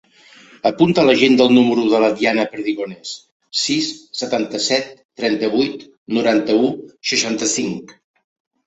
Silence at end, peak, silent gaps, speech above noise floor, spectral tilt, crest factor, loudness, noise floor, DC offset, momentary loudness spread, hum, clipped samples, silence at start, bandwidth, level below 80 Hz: 0.75 s; -2 dBFS; 3.32-3.40 s, 5.05-5.09 s, 5.97-6.06 s; 30 dB; -3.5 dB/octave; 16 dB; -17 LUFS; -47 dBFS; under 0.1%; 14 LU; none; under 0.1%; 0.65 s; 8.2 kHz; -60 dBFS